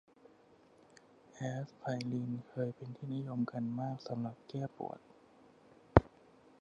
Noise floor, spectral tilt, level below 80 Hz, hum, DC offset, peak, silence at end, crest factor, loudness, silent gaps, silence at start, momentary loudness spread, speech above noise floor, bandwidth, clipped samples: -64 dBFS; -8 dB/octave; -52 dBFS; none; under 0.1%; -2 dBFS; 0.55 s; 36 dB; -38 LUFS; none; 1.35 s; 15 LU; 25 dB; 10 kHz; under 0.1%